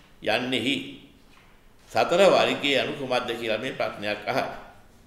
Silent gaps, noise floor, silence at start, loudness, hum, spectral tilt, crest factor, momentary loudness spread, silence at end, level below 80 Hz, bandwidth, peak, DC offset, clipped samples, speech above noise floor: none; -53 dBFS; 0.2 s; -24 LUFS; none; -4 dB/octave; 20 dB; 11 LU; 0.35 s; -58 dBFS; 15.5 kHz; -6 dBFS; under 0.1%; under 0.1%; 29 dB